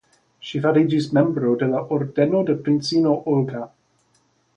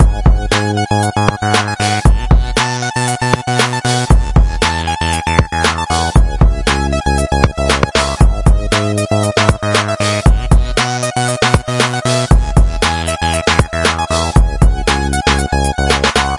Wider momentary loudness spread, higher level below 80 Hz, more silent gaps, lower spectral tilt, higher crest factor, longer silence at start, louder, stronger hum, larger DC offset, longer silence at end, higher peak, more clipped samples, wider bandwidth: first, 10 LU vs 3 LU; second, -62 dBFS vs -16 dBFS; neither; first, -7.5 dB/octave vs -4.5 dB/octave; first, 18 dB vs 12 dB; first, 0.45 s vs 0 s; second, -20 LUFS vs -13 LUFS; neither; neither; first, 0.9 s vs 0 s; second, -4 dBFS vs 0 dBFS; neither; second, 9.8 kHz vs 11.5 kHz